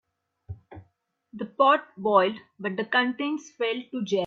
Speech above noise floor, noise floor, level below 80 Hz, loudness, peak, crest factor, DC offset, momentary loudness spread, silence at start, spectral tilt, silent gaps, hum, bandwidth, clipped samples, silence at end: 45 dB; -70 dBFS; -64 dBFS; -25 LUFS; -6 dBFS; 20 dB; under 0.1%; 22 LU; 0.5 s; -5 dB/octave; none; none; 7.6 kHz; under 0.1%; 0 s